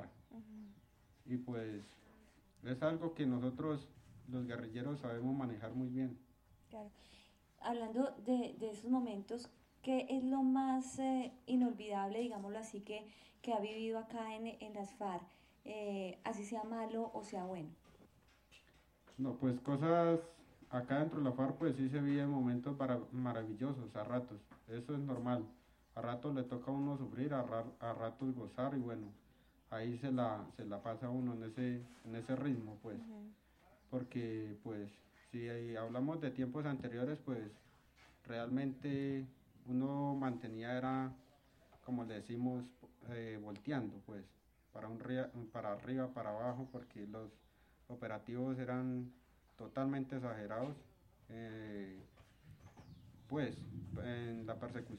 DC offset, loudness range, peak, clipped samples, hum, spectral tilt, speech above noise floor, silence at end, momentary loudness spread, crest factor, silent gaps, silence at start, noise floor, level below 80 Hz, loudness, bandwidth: under 0.1%; 7 LU; -22 dBFS; under 0.1%; none; -7.5 dB/octave; 28 dB; 0 s; 16 LU; 20 dB; none; 0 s; -69 dBFS; -72 dBFS; -42 LUFS; 11 kHz